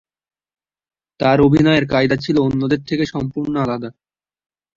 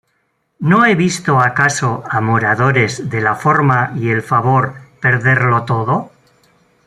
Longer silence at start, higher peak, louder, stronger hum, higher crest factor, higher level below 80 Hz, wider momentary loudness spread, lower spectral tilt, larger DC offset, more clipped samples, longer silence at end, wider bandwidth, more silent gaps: first, 1.2 s vs 0.6 s; about the same, -2 dBFS vs -2 dBFS; second, -17 LUFS vs -14 LUFS; neither; about the same, 16 dB vs 14 dB; first, -46 dBFS vs -52 dBFS; first, 10 LU vs 6 LU; first, -7.5 dB/octave vs -6 dB/octave; neither; neither; about the same, 0.85 s vs 0.8 s; second, 7.4 kHz vs 12 kHz; neither